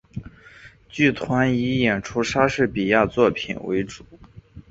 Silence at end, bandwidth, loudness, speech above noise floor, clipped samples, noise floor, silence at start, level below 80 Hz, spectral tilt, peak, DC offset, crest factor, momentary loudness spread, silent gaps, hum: 0.1 s; 8 kHz; -21 LUFS; 26 dB; under 0.1%; -47 dBFS; 0.15 s; -48 dBFS; -6 dB/octave; -2 dBFS; under 0.1%; 20 dB; 16 LU; none; none